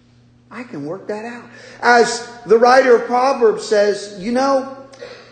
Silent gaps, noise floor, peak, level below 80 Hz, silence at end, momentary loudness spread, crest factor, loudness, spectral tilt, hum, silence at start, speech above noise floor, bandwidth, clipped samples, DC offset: none; -50 dBFS; 0 dBFS; -60 dBFS; 0.15 s; 22 LU; 16 dB; -15 LUFS; -3.5 dB/octave; none; 0.5 s; 35 dB; 9.4 kHz; under 0.1%; under 0.1%